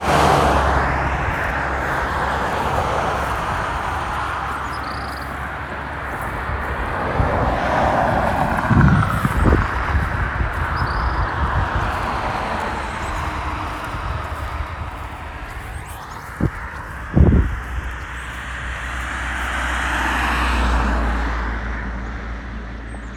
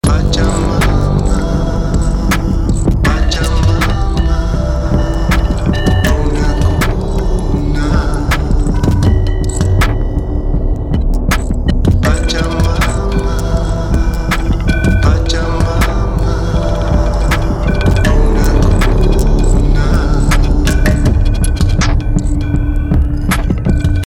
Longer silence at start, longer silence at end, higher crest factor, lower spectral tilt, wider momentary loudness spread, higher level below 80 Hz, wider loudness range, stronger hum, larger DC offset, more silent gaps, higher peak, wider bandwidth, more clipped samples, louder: about the same, 0 s vs 0.05 s; about the same, 0 s vs 0 s; first, 20 dB vs 10 dB; about the same, -6 dB/octave vs -6 dB/octave; first, 13 LU vs 4 LU; second, -26 dBFS vs -14 dBFS; first, 7 LU vs 2 LU; neither; neither; neither; about the same, 0 dBFS vs 0 dBFS; second, 14.5 kHz vs 16 kHz; neither; second, -21 LUFS vs -14 LUFS